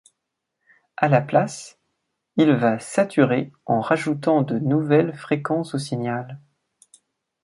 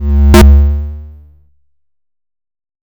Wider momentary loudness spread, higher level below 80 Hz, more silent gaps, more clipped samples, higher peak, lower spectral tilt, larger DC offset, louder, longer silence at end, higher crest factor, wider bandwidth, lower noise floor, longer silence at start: second, 11 LU vs 20 LU; second, -66 dBFS vs -12 dBFS; neither; neither; about the same, -2 dBFS vs 0 dBFS; about the same, -7 dB/octave vs -6.5 dB/octave; neither; second, -21 LUFS vs -8 LUFS; second, 1.05 s vs 1.85 s; first, 20 dB vs 10 dB; second, 11.5 kHz vs over 20 kHz; first, -80 dBFS vs -64 dBFS; first, 1 s vs 0 s